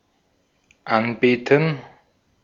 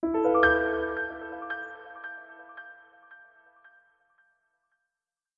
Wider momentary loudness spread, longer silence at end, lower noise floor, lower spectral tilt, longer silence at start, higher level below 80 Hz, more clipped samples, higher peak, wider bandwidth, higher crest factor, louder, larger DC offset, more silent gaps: second, 14 LU vs 24 LU; second, 0.55 s vs 2.2 s; second, -65 dBFS vs under -90 dBFS; about the same, -7.5 dB/octave vs -7 dB/octave; first, 0.85 s vs 0 s; second, -64 dBFS vs -56 dBFS; neither; first, -2 dBFS vs -10 dBFS; about the same, 7.2 kHz vs 6.8 kHz; about the same, 22 dB vs 22 dB; first, -20 LUFS vs -26 LUFS; neither; neither